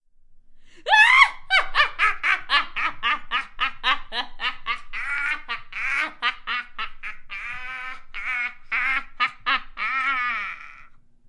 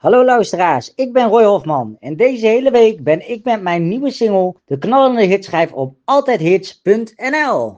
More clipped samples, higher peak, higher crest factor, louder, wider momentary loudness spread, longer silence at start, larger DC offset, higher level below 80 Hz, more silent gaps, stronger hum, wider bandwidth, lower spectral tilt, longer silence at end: neither; about the same, 0 dBFS vs 0 dBFS; first, 24 dB vs 14 dB; second, -22 LUFS vs -14 LUFS; first, 16 LU vs 8 LU; first, 0.3 s vs 0.05 s; neither; first, -44 dBFS vs -62 dBFS; neither; neither; first, 11 kHz vs 8 kHz; second, -0.5 dB/octave vs -6 dB/octave; first, 0.3 s vs 0.05 s